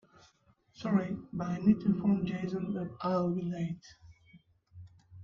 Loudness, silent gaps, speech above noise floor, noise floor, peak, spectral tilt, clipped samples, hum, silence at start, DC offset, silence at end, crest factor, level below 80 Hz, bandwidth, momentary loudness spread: -32 LUFS; none; 37 dB; -68 dBFS; -14 dBFS; -8.5 dB/octave; under 0.1%; none; 0.8 s; under 0.1%; 0 s; 20 dB; -64 dBFS; 7 kHz; 10 LU